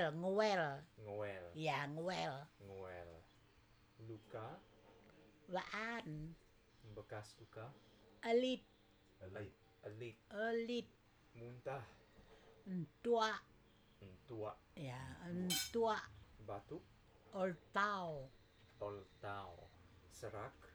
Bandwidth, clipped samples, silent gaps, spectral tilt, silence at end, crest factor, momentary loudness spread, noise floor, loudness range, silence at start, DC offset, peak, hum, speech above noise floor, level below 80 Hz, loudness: over 20 kHz; under 0.1%; none; -4.5 dB/octave; 0 s; 22 dB; 22 LU; -70 dBFS; 7 LU; 0 s; under 0.1%; -24 dBFS; none; 26 dB; -72 dBFS; -44 LUFS